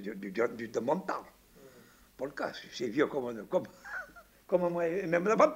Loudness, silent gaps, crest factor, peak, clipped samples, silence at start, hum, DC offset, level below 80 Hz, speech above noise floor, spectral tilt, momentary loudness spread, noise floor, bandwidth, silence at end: -33 LUFS; none; 22 dB; -12 dBFS; under 0.1%; 0 s; none; under 0.1%; -68 dBFS; 27 dB; -6 dB/octave; 12 LU; -59 dBFS; 16 kHz; 0 s